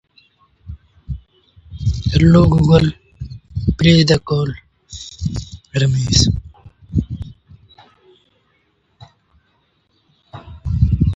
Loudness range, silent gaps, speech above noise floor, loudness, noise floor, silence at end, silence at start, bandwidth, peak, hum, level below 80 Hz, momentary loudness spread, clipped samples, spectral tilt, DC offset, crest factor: 16 LU; none; 50 dB; -16 LUFS; -62 dBFS; 0 s; 0.65 s; 8.2 kHz; 0 dBFS; none; -28 dBFS; 24 LU; under 0.1%; -6 dB/octave; under 0.1%; 18 dB